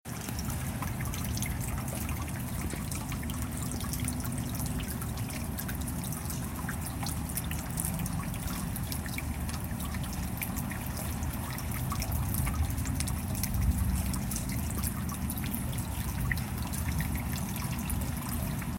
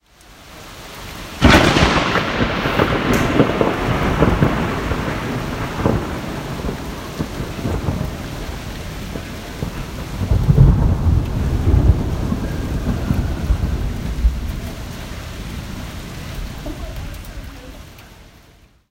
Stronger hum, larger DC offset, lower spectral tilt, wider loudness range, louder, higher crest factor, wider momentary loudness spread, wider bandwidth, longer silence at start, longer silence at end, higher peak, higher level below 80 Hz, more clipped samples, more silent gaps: neither; neither; second, -4.5 dB/octave vs -6 dB/octave; second, 3 LU vs 14 LU; second, -34 LUFS vs -19 LUFS; about the same, 22 dB vs 18 dB; second, 4 LU vs 17 LU; about the same, 17 kHz vs 16.5 kHz; second, 0.05 s vs 0.3 s; second, 0 s vs 0.65 s; second, -12 dBFS vs 0 dBFS; second, -38 dBFS vs -24 dBFS; neither; neither